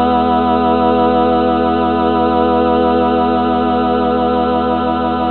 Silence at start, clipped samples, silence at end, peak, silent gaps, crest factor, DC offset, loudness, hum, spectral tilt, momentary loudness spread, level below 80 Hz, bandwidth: 0 s; under 0.1%; 0 s; -2 dBFS; none; 12 dB; 1%; -14 LUFS; none; -9.5 dB/octave; 2 LU; -36 dBFS; 4.5 kHz